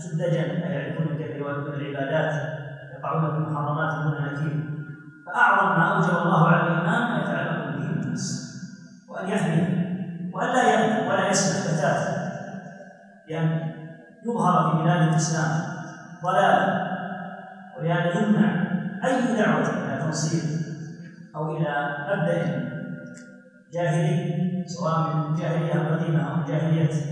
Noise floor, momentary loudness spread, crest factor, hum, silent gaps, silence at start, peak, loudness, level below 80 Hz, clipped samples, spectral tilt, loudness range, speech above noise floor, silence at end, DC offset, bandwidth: -48 dBFS; 16 LU; 18 dB; none; none; 0 s; -6 dBFS; -24 LUFS; -68 dBFS; under 0.1%; -6 dB/octave; 6 LU; 25 dB; 0 s; under 0.1%; 10.5 kHz